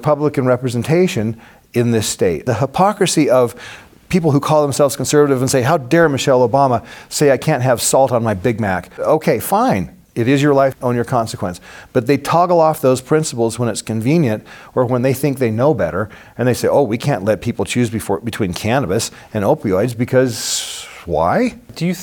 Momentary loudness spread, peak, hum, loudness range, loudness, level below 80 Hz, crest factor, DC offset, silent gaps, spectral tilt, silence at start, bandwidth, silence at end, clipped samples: 9 LU; -2 dBFS; none; 4 LU; -16 LUFS; -48 dBFS; 14 dB; under 0.1%; none; -5.5 dB/octave; 0 s; 20 kHz; 0 s; under 0.1%